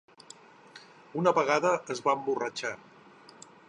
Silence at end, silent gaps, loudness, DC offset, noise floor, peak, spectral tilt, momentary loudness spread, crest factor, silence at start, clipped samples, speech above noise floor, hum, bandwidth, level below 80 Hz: 0.95 s; none; -29 LUFS; under 0.1%; -54 dBFS; -10 dBFS; -4.5 dB/octave; 25 LU; 22 dB; 0.75 s; under 0.1%; 26 dB; none; 11 kHz; -78 dBFS